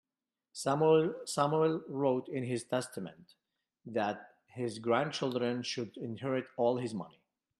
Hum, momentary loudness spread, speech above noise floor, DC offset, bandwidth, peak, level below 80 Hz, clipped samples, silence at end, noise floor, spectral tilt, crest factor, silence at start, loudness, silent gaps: none; 14 LU; over 57 dB; under 0.1%; 13 kHz; -14 dBFS; -78 dBFS; under 0.1%; 0.5 s; under -90 dBFS; -5.5 dB/octave; 20 dB; 0.55 s; -33 LUFS; none